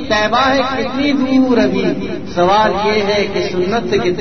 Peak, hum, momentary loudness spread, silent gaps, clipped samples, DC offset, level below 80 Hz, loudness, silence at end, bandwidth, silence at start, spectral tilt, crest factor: 0 dBFS; none; 5 LU; none; under 0.1%; 3%; -40 dBFS; -14 LUFS; 0 s; 6.6 kHz; 0 s; -5.5 dB/octave; 14 dB